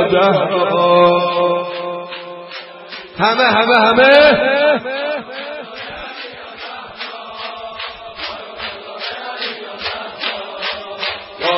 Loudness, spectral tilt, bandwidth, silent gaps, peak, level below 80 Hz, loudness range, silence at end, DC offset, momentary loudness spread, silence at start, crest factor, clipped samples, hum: -15 LUFS; -6.5 dB/octave; 5.8 kHz; none; 0 dBFS; -52 dBFS; 14 LU; 0 s; under 0.1%; 18 LU; 0 s; 16 dB; under 0.1%; none